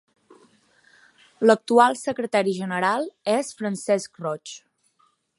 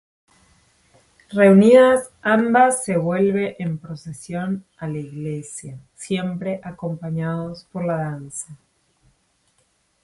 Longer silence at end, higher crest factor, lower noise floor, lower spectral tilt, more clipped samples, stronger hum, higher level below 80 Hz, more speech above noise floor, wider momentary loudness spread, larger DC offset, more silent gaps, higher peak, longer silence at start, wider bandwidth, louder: second, 0.8 s vs 1.5 s; about the same, 22 dB vs 20 dB; about the same, -66 dBFS vs -65 dBFS; second, -4.5 dB/octave vs -6 dB/octave; neither; neither; second, -76 dBFS vs -60 dBFS; about the same, 44 dB vs 46 dB; second, 13 LU vs 20 LU; neither; neither; about the same, -2 dBFS vs 0 dBFS; about the same, 1.4 s vs 1.3 s; about the same, 11.5 kHz vs 11.5 kHz; second, -22 LUFS vs -19 LUFS